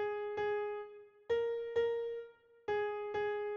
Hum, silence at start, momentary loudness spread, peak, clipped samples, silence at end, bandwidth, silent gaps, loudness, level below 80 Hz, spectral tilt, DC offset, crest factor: none; 0 s; 12 LU; -24 dBFS; under 0.1%; 0 s; 6.8 kHz; none; -38 LUFS; -72 dBFS; -5 dB/octave; under 0.1%; 14 dB